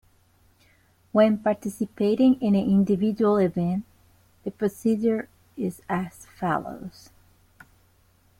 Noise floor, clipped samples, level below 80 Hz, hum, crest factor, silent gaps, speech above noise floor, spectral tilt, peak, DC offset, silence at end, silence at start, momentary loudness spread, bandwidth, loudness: -61 dBFS; under 0.1%; -60 dBFS; none; 18 dB; none; 38 dB; -7.5 dB/octave; -8 dBFS; under 0.1%; 1.5 s; 1.15 s; 17 LU; 15.5 kHz; -24 LUFS